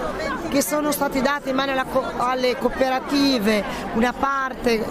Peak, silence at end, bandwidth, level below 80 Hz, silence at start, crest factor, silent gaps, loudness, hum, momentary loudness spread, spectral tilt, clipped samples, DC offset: -4 dBFS; 0 s; 16 kHz; -42 dBFS; 0 s; 18 dB; none; -22 LUFS; none; 4 LU; -4 dB/octave; under 0.1%; under 0.1%